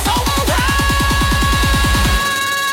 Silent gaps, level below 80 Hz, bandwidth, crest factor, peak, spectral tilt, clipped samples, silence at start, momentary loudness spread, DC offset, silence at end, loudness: none; -20 dBFS; 16.5 kHz; 12 dB; -2 dBFS; -3.5 dB/octave; under 0.1%; 0 s; 2 LU; under 0.1%; 0 s; -14 LUFS